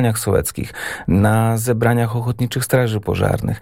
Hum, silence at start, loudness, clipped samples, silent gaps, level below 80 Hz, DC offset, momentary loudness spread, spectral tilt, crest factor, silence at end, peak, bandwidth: none; 0 s; -18 LUFS; under 0.1%; none; -38 dBFS; under 0.1%; 8 LU; -6 dB/octave; 14 dB; 0 s; -2 dBFS; 17 kHz